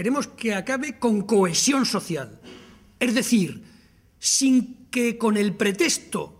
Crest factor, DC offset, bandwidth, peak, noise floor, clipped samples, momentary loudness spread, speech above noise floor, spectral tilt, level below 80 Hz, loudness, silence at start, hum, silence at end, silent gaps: 16 dB; under 0.1%; 16 kHz; -6 dBFS; -55 dBFS; under 0.1%; 10 LU; 32 dB; -3.5 dB/octave; -62 dBFS; -22 LUFS; 0 s; none; 0.1 s; none